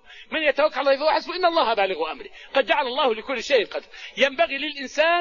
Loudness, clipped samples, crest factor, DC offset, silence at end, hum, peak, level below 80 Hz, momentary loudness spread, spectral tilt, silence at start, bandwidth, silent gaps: -22 LUFS; under 0.1%; 18 dB; 0.2%; 0 s; none; -6 dBFS; -58 dBFS; 9 LU; -2 dB/octave; 0.1 s; 7.4 kHz; none